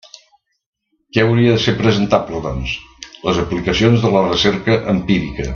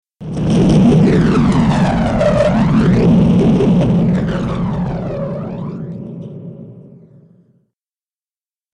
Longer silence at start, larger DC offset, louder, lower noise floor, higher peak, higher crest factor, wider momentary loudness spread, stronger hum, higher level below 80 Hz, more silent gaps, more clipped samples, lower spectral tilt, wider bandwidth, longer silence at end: first, 1.15 s vs 0.2 s; neither; second, -16 LUFS vs -13 LUFS; second, -57 dBFS vs under -90 dBFS; about the same, 0 dBFS vs -2 dBFS; about the same, 16 dB vs 12 dB; second, 10 LU vs 17 LU; neither; second, -36 dBFS vs -30 dBFS; neither; neither; second, -6 dB/octave vs -8.5 dB/octave; second, 7.2 kHz vs 10.5 kHz; second, 0 s vs 1.9 s